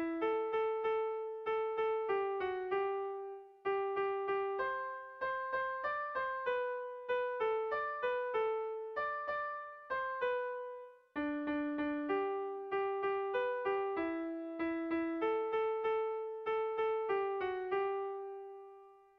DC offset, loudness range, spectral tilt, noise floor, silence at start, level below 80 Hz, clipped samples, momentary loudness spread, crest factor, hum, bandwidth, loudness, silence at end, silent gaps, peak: under 0.1%; 2 LU; -6.5 dB/octave; -58 dBFS; 0 s; -74 dBFS; under 0.1%; 7 LU; 12 dB; none; 5.4 kHz; -37 LUFS; 0.2 s; none; -24 dBFS